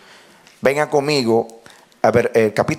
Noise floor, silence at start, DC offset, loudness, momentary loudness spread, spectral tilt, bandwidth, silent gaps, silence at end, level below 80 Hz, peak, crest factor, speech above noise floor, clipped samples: -47 dBFS; 0.65 s; under 0.1%; -17 LUFS; 5 LU; -5.5 dB/octave; 15.5 kHz; none; 0 s; -54 dBFS; -2 dBFS; 18 dB; 31 dB; under 0.1%